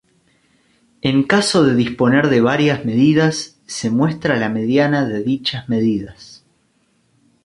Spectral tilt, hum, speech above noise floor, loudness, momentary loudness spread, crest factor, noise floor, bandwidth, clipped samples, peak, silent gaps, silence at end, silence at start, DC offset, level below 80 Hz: -5.5 dB/octave; none; 45 dB; -16 LUFS; 9 LU; 16 dB; -61 dBFS; 11.5 kHz; under 0.1%; -2 dBFS; none; 1.1 s; 1.05 s; under 0.1%; -52 dBFS